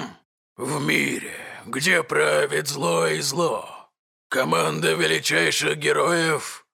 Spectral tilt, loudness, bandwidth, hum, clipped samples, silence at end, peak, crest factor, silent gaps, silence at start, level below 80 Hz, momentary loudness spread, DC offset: -3 dB/octave; -22 LUFS; 17 kHz; none; under 0.1%; 0.15 s; -4 dBFS; 18 dB; 0.25-0.56 s, 3.99-4.30 s; 0 s; -68 dBFS; 12 LU; under 0.1%